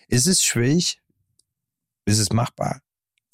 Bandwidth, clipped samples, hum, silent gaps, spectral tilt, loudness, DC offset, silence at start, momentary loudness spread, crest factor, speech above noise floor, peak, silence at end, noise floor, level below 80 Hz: 16 kHz; under 0.1%; none; none; -3.5 dB/octave; -20 LUFS; under 0.1%; 0.1 s; 14 LU; 14 dB; 65 dB; -8 dBFS; 0.55 s; -85 dBFS; -52 dBFS